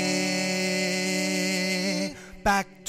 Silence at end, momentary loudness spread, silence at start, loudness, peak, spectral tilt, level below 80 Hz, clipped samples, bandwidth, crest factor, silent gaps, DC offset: 0 s; 4 LU; 0 s; -26 LUFS; -12 dBFS; -3.5 dB/octave; -50 dBFS; under 0.1%; 16 kHz; 16 dB; none; under 0.1%